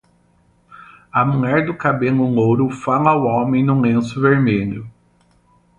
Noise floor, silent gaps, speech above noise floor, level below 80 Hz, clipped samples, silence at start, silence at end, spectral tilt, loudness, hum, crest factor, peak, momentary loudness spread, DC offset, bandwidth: -57 dBFS; none; 41 dB; -50 dBFS; under 0.1%; 0.8 s; 0.9 s; -8.5 dB/octave; -17 LUFS; none; 16 dB; 0 dBFS; 4 LU; under 0.1%; 9 kHz